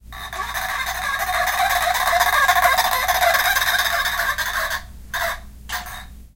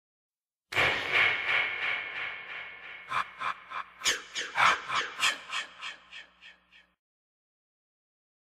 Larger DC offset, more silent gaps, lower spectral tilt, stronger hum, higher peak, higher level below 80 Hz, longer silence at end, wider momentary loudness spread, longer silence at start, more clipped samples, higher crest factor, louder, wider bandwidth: neither; neither; about the same, -0.5 dB/octave vs -0.5 dB/octave; neither; first, -2 dBFS vs -10 dBFS; first, -40 dBFS vs -66 dBFS; second, 0.1 s vs 1.9 s; second, 14 LU vs 17 LU; second, 0.05 s vs 0.7 s; neither; second, 18 dB vs 24 dB; first, -19 LUFS vs -29 LUFS; about the same, 17 kHz vs 15.5 kHz